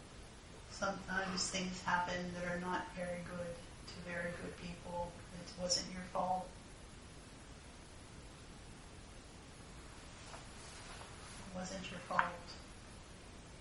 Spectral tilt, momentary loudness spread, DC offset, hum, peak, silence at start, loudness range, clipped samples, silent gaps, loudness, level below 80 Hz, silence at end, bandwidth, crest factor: -3.5 dB/octave; 18 LU; under 0.1%; none; -14 dBFS; 0 s; 14 LU; under 0.1%; none; -42 LUFS; -60 dBFS; 0 s; 11.5 kHz; 30 dB